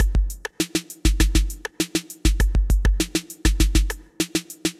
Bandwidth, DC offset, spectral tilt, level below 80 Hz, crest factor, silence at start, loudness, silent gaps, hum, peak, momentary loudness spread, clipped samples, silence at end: 15 kHz; under 0.1%; -4 dB/octave; -22 dBFS; 16 dB; 0 s; -24 LUFS; none; none; -4 dBFS; 7 LU; under 0.1%; 0.1 s